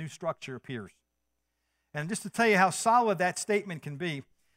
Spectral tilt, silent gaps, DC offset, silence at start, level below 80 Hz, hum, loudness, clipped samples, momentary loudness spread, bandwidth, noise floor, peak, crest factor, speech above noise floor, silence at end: -4 dB/octave; none; under 0.1%; 0 s; -76 dBFS; none; -28 LUFS; under 0.1%; 17 LU; 16 kHz; -82 dBFS; -10 dBFS; 20 dB; 53 dB; 0.35 s